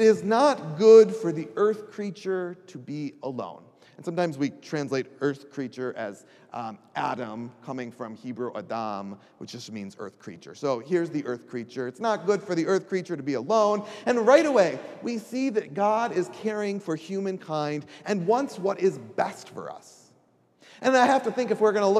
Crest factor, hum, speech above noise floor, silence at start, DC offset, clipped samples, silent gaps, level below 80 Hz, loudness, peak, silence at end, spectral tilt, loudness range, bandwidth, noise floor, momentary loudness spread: 22 dB; none; 38 dB; 0 s; under 0.1%; under 0.1%; none; -82 dBFS; -26 LUFS; -4 dBFS; 0 s; -5.5 dB/octave; 10 LU; 11.5 kHz; -63 dBFS; 17 LU